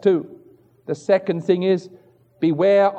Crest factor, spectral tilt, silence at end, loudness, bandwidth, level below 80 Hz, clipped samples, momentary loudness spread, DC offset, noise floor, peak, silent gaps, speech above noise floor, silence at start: 16 dB; -7.5 dB/octave; 0 s; -20 LUFS; 8.6 kHz; -76 dBFS; under 0.1%; 14 LU; under 0.1%; -51 dBFS; -6 dBFS; none; 32 dB; 0.05 s